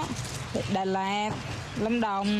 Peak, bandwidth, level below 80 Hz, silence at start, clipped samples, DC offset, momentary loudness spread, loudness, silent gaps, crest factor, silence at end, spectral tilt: -16 dBFS; 13.5 kHz; -50 dBFS; 0 s; under 0.1%; under 0.1%; 7 LU; -30 LUFS; none; 14 dB; 0 s; -5 dB/octave